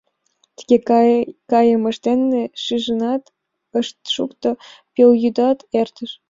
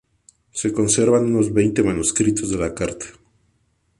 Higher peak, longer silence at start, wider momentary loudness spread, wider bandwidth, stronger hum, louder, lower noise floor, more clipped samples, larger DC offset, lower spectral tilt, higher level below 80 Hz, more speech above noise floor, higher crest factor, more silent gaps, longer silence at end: about the same, -2 dBFS vs -4 dBFS; about the same, 0.6 s vs 0.55 s; about the same, 10 LU vs 12 LU; second, 7.6 kHz vs 11.5 kHz; neither; about the same, -18 LUFS vs -19 LUFS; about the same, -64 dBFS vs -65 dBFS; neither; neither; about the same, -5.5 dB/octave vs -5 dB/octave; second, -62 dBFS vs -44 dBFS; about the same, 47 dB vs 46 dB; about the same, 16 dB vs 16 dB; neither; second, 0.15 s vs 0.9 s